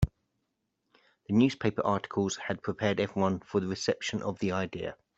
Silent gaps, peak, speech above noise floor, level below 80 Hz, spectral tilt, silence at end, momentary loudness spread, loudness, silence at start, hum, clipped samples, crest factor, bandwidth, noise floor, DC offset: none; -12 dBFS; 51 dB; -50 dBFS; -5.5 dB/octave; 0.25 s; 7 LU; -30 LUFS; 0 s; none; under 0.1%; 20 dB; 8.2 kHz; -81 dBFS; under 0.1%